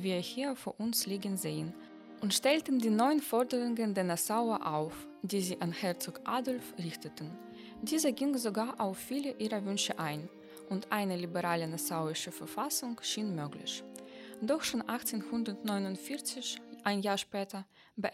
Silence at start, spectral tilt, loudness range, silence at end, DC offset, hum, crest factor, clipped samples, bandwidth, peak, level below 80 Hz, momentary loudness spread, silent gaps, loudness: 0 s; -4 dB/octave; 5 LU; 0 s; under 0.1%; none; 20 dB; under 0.1%; 16 kHz; -14 dBFS; -76 dBFS; 12 LU; none; -35 LUFS